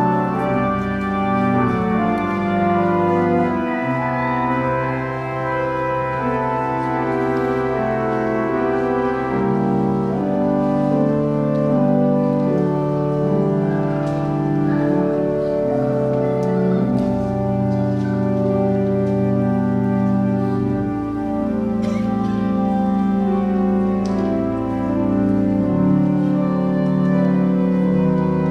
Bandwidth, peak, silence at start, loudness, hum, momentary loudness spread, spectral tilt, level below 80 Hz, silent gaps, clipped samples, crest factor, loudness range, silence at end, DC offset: 6.6 kHz; -6 dBFS; 0 s; -19 LUFS; none; 4 LU; -9.5 dB/octave; -42 dBFS; none; under 0.1%; 12 dB; 2 LU; 0 s; under 0.1%